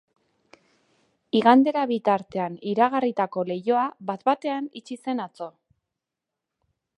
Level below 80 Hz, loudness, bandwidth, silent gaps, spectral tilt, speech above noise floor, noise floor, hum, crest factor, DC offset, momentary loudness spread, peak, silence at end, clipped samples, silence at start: -74 dBFS; -24 LUFS; 10.5 kHz; none; -6.5 dB/octave; 63 dB; -86 dBFS; none; 22 dB; under 0.1%; 16 LU; -2 dBFS; 1.5 s; under 0.1%; 1.35 s